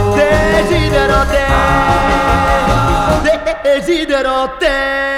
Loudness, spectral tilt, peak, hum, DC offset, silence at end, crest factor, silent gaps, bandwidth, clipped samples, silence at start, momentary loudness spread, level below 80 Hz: -12 LUFS; -5.5 dB/octave; 0 dBFS; none; under 0.1%; 0 s; 10 dB; none; 17 kHz; under 0.1%; 0 s; 3 LU; -22 dBFS